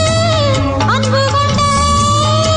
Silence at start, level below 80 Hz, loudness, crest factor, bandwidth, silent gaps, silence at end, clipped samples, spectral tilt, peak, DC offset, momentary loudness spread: 0 s; -30 dBFS; -12 LUFS; 10 dB; 11 kHz; none; 0 s; under 0.1%; -4.5 dB/octave; -2 dBFS; under 0.1%; 2 LU